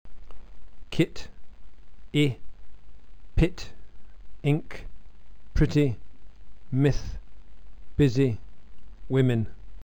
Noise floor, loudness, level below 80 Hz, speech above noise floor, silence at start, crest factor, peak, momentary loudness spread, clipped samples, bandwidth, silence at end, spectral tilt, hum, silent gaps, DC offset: -47 dBFS; -27 LUFS; -38 dBFS; 23 dB; 0.05 s; 18 dB; -8 dBFS; 20 LU; under 0.1%; 14.5 kHz; 0 s; -7.5 dB/octave; none; none; 2%